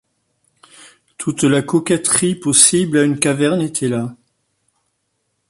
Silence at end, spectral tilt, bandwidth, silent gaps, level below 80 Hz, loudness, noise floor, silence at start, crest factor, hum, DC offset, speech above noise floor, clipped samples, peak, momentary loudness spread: 1.35 s; -3.5 dB/octave; 15 kHz; none; -56 dBFS; -15 LUFS; -70 dBFS; 1.2 s; 18 dB; none; under 0.1%; 54 dB; under 0.1%; 0 dBFS; 13 LU